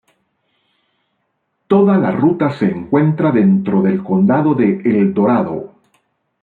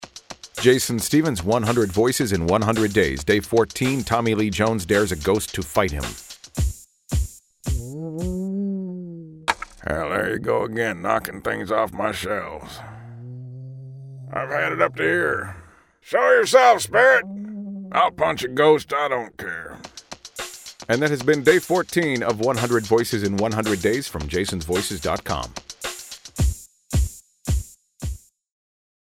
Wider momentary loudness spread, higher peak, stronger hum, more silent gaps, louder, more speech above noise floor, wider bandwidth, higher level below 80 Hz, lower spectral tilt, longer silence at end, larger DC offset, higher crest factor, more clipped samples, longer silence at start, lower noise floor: second, 5 LU vs 19 LU; about the same, -2 dBFS vs -2 dBFS; neither; neither; first, -14 LUFS vs -21 LUFS; first, 55 dB vs 21 dB; second, 4.5 kHz vs 17 kHz; second, -56 dBFS vs -36 dBFS; first, -11 dB/octave vs -4.5 dB/octave; about the same, 0.75 s vs 0.85 s; neither; second, 14 dB vs 20 dB; neither; first, 1.7 s vs 0 s; first, -69 dBFS vs -42 dBFS